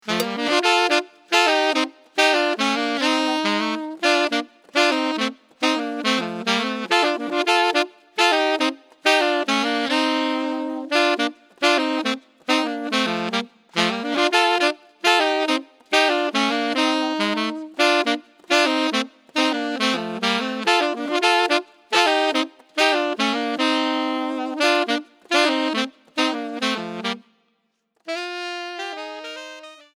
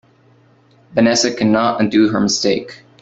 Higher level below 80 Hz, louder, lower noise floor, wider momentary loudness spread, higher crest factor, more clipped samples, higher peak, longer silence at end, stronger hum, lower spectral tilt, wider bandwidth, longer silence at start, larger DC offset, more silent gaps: second, -76 dBFS vs -54 dBFS; second, -21 LUFS vs -15 LUFS; first, -70 dBFS vs -51 dBFS; about the same, 9 LU vs 9 LU; first, 22 dB vs 16 dB; neither; about the same, 0 dBFS vs 0 dBFS; about the same, 0.2 s vs 0.25 s; neither; second, -2.5 dB/octave vs -4 dB/octave; first, over 20 kHz vs 8 kHz; second, 0.05 s vs 0.95 s; neither; neither